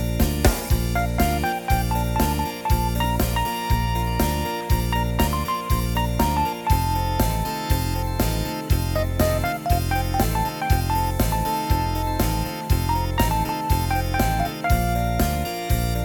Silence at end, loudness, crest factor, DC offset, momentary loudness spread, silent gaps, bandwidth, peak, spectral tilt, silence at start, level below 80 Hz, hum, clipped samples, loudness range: 0 s; -23 LUFS; 20 dB; under 0.1%; 3 LU; none; 19 kHz; -2 dBFS; -5.5 dB/octave; 0 s; -26 dBFS; none; under 0.1%; 1 LU